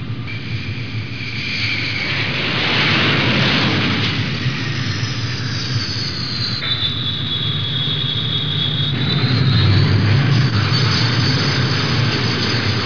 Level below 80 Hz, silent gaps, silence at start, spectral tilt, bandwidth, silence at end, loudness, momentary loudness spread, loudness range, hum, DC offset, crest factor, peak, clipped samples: -42 dBFS; none; 0 s; -5 dB/octave; 5.4 kHz; 0 s; -17 LUFS; 7 LU; 4 LU; none; 2%; 14 dB; -4 dBFS; under 0.1%